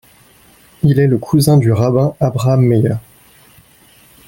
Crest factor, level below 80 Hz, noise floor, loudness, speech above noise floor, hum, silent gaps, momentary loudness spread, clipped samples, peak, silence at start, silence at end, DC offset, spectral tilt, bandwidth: 14 dB; -44 dBFS; -47 dBFS; -13 LUFS; 35 dB; none; none; 6 LU; under 0.1%; 0 dBFS; 0.85 s; 1.3 s; under 0.1%; -7.5 dB/octave; 17 kHz